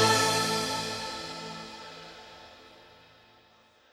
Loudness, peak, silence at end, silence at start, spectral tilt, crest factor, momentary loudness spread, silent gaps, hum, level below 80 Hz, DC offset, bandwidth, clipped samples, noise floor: -29 LUFS; -10 dBFS; 1.1 s; 0 s; -2.5 dB/octave; 22 dB; 25 LU; none; none; -64 dBFS; under 0.1%; 17 kHz; under 0.1%; -61 dBFS